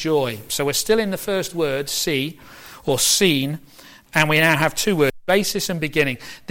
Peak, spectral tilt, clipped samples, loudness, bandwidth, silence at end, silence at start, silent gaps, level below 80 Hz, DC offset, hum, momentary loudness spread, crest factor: -4 dBFS; -3.5 dB/octave; under 0.1%; -20 LUFS; 17 kHz; 0.15 s; 0 s; none; -48 dBFS; under 0.1%; none; 9 LU; 16 dB